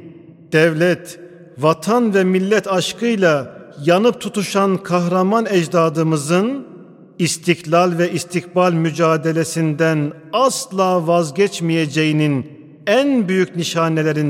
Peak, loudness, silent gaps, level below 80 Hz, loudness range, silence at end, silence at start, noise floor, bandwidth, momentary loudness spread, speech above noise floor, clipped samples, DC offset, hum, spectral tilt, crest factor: 0 dBFS; -17 LUFS; none; -66 dBFS; 1 LU; 0 s; 0 s; -40 dBFS; 16 kHz; 6 LU; 24 dB; under 0.1%; under 0.1%; none; -5.5 dB/octave; 16 dB